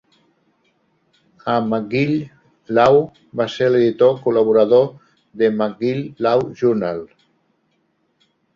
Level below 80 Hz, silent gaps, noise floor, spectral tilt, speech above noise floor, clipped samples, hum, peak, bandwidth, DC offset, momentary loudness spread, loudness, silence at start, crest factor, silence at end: -58 dBFS; none; -66 dBFS; -7.5 dB/octave; 49 dB; under 0.1%; none; -2 dBFS; 7.2 kHz; under 0.1%; 11 LU; -17 LUFS; 1.45 s; 18 dB; 1.5 s